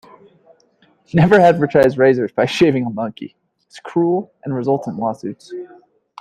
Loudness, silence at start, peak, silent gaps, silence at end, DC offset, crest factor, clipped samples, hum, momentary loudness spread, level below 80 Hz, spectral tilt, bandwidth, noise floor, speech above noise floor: -16 LUFS; 1.15 s; 0 dBFS; none; 0.55 s; under 0.1%; 16 dB; under 0.1%; none; 21 LU; -52 dBFS; -7.5 dB/octave; 13 kHz; -57 dBFS; 41 dB